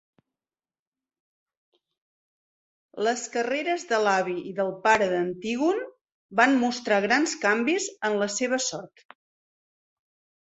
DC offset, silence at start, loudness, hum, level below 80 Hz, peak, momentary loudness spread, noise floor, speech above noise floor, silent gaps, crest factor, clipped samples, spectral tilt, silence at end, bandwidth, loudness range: under 0.1%; 2.95 s; -25 LUFS; none; -70 dBFS; -4 dBFS; 8 LU; under -90 dBFS; over 65 dB; 6.01-6.05 s, 6.12-6.29 s; 24 dB; under 0.1%; -3 dB/octave; 1.6 s; 8.4 kHz; 8 LU